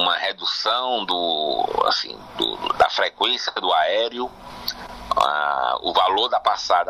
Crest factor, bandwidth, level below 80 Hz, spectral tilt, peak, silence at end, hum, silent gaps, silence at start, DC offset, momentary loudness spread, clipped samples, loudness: 18 dB; 15.5 kHz; -52 dBFS; -2 dB/octave; -4 dBFS; 0 s; none; none; 0 s; under 0.1%; 11 LU; under 0.1%; -21 LUFS